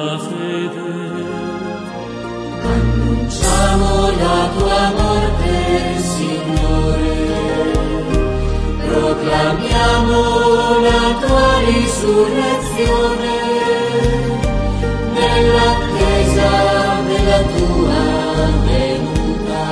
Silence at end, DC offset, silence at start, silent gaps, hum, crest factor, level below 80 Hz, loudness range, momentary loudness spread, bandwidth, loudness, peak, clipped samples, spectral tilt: 0 s; under 0.1%; 0 s; none; none; 14 dB; -22 dBFS; 4 LU; 9 LU; 11 kHz; -15 LUFS; 0 dBFS; under 0.1%; -5.5 dB/octave